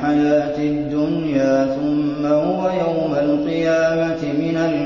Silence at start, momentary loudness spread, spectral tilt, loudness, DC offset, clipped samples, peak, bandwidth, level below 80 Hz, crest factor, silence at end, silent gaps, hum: 0 s; 4 LU; -7 dB/octave; -19 LUFS; under 0.1%; under 0.1%; -6 dBFS; 7 kHz; -48 dBFS; 12 dB; 0 s; none; none